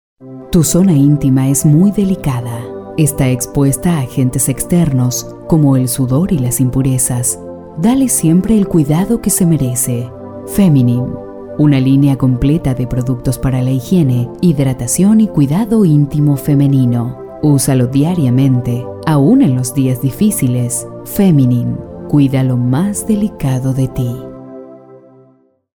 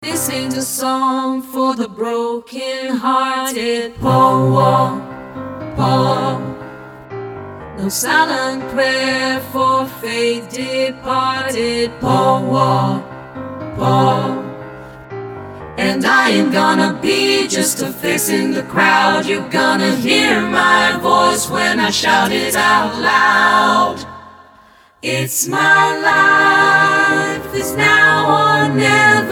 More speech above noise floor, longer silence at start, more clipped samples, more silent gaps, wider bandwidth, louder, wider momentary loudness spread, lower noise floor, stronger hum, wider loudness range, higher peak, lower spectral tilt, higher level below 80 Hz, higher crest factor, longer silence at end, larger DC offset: first, 39 dB vs 32 dB; first, 0.2 s vs 0 s; neither; neither; about the same, over 20 kHz vs 19 kHz; about the same, -13 LUFS vs -14 LUFS; second, 10 LU vs 17 LU; first, -51 dBFS vs -47 dBFS; neither; second, 2 LU vs 6 LU; about the same, 0 dBFS vs 0 dBFS; first, -6.5 dB/octave vs -4 dB/octave; first, -34 dBFS vs -48 dBFS; about the same, 12 dB vs 16 dB; first, 0.8 s vs 0 s; neither